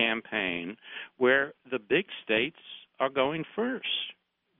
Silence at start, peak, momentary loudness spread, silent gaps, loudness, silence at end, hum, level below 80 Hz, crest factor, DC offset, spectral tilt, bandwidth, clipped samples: 0 s; -10 dBFS; 15 LU; none; -29 LUFS; 0.5 s; none; -68 dBFS; 20 dB; under 0.1%; -1.5 dB/octave; 4 kHz; under 0.1%